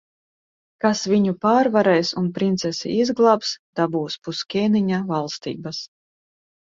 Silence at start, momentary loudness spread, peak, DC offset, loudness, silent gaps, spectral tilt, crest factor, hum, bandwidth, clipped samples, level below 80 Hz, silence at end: 0.85 s; 12 LU; -4 dBFS; under 0.1%; -21 LUFS; 3.59-3.73 s; -5.5 dB/octave; 18 dB; none; 7.6 kHz; under 0.1%; -64 dBFS; 0.85 s